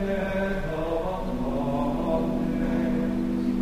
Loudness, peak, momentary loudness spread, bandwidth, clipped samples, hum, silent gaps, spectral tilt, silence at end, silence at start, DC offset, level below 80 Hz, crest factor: -27 LUFS; -14 dBFS; 3 LU; 15 kHz; under 0.1%; none; none; -8 dB/octave; 0 s; 0 s; 0.2%; -36 dBFS; 12 dB